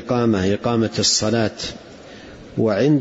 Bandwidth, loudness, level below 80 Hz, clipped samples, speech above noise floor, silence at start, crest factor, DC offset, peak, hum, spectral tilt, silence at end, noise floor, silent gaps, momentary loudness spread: 8 kHz; -19 LUFS; -50 dBFS; under 0.1%; 21 dB; 0 s; 14 dB; under 0.1%; -6 dBFS; none; -4.5 dB/octave; 0 s; -39 dBFS; none; 23 LU